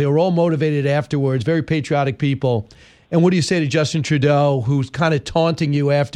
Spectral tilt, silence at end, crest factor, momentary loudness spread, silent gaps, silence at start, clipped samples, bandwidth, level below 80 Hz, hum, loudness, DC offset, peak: -6.5 dB/octave; 0.05 s; 14 dB; 4 LU; none; 0 s; under 0.1%; 10.5 kHz; -50 dBFS; none; -18 LUFS; under 0.1%; -2 dBFS